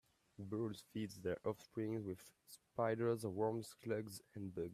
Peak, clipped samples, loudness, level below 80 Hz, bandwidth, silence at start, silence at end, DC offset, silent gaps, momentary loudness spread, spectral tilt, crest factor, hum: -26 dBFS; under 0.1%; -44 LUFS; -78 dBFS; 15.5 kHz; 0.4 s; 0 s; under 0.1%; none; 12 LU; -6.5 dB/octave; 18 dB; none